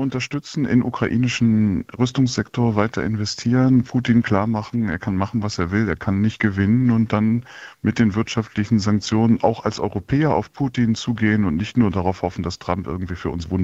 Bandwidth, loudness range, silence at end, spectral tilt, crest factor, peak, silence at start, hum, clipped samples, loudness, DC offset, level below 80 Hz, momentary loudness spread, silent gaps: 8 kHz; 2 LU; 0 s; -6.5 dB/octave; 18 dB; -2 dBFS; 0 s; none; under 0.1%; -20 LUFS; under 0.1%; -46 dBFS; 8 LU; none